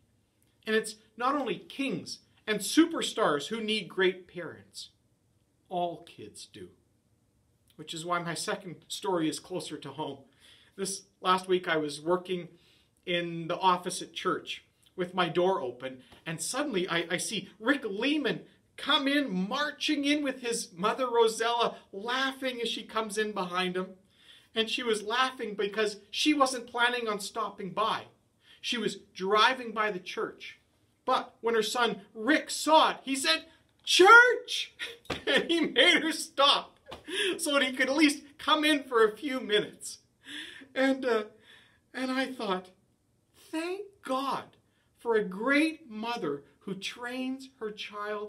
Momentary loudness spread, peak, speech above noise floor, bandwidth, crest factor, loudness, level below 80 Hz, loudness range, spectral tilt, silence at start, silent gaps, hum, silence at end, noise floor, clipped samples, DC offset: 16 LU; -6 dBFS; 41 dB; 16 kHz; 24 dB; -29 LUFS; -72 dBFS; 12 LU; -3 dB/octave; 0.65 s; none; none; 0 s; -71 dBFS; under 0.1%; under 0.1%